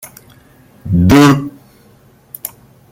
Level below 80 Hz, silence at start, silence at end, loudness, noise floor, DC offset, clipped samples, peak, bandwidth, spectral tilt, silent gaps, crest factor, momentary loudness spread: -36 dBFS; 0.05 s; 0.45 s; -10 LUFS; -46 dBFS; under 0.1%; under 0.1%; 0 dBFS; 16.5 kHz; -6.5 dB/octave; none; 14 dB; 24 LU